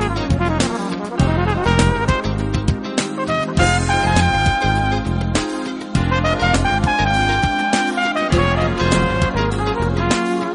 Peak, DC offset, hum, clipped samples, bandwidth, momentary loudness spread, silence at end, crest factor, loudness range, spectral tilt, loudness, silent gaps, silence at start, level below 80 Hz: 0 dBFS; under 0.1%; none; under 0.1%; 10.5 kHz; 5 LU; 0 s; 16 dB; 2 LU; -5 dB/octave; -18 LUFS; none; 0 s; -28 dBFS